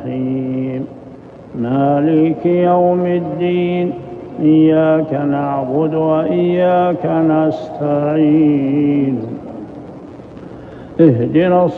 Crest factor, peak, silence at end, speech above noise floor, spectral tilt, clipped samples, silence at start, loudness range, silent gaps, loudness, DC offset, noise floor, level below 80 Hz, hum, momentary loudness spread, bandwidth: 14 dB; 0 dBFS; 0 s; 22 dB; -10.5 dB/octave; under 0.1%; 0 s; 2 LU; none; -14 LUFS; under 0.1%; -35 dBFS; -52 dBFS; none; 19 LU; 4.3 kHz